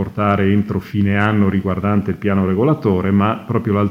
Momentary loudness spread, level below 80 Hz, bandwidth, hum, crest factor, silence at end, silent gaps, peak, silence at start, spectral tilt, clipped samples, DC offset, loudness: 4 LU; -50 dBFS; 5.6 kHz; none; 16 dB; 0 s; none; 0 dBFS; 0 s; -9.5 dB/octave; under 0.1%; under 0.1%; -17 LUFS